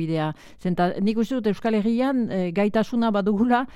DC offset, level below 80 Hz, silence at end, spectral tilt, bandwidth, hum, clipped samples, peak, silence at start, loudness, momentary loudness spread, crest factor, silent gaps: under 0.1%; -54 dBFS; 0.05 s; -7.5 dB/octave; 12 kHz; none; under 0.1%; -8 dBFS; 0 s; -23 LUFS; 5 LU; 16 dB; none